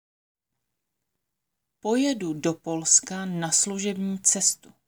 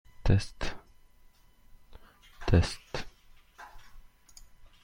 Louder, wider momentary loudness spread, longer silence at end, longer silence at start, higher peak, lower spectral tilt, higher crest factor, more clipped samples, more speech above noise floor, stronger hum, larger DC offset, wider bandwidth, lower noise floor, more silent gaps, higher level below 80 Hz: first, -23 LUFS vs -31 LUFS; second, 10 LU vs 24 LU; about the same, 0.3 s vs 0.2 s; first, 1.85 s vs 0.2 s; first, -6 dBFS vs -10 dBFS; second, -2.5 dB/octave vs -6 dB/octave; about the same, 22 dB vs 24 dB; neither; first, 58 dB vs 31 dB; neither; neither; first, over 20 kHz vs 11 kHz; first, -83 dBFS vs -58 dBFS; neither; second, -74 dBFS vs -40 dBFS